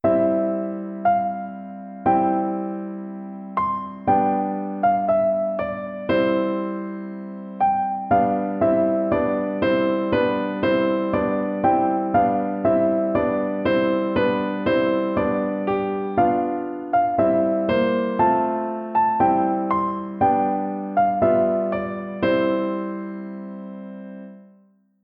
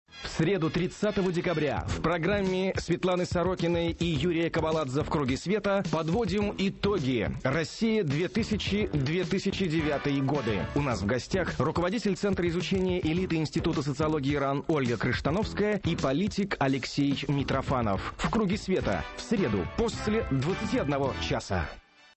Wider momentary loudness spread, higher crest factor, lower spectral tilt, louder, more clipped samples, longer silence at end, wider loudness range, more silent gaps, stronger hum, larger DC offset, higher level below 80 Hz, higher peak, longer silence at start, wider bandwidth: first, 12 LU vs 2 LU; about the same, 16 dB vs 12 dB; first, -10 dB/octave vs -6 dB/octave; first, -21 LUFS vs -29 LUFS; neither; first, 0.6 s vs 0.35 s; about the same, 3 LU vs 1 LU; neither; neither; neither; second, -54 dBFS vs -44 dBFS; first, -6 dBFS vs -16 dBFS; about the same, 0.05 s vs 0.1 s; second, 5.2 kHz vs 8.6 kHz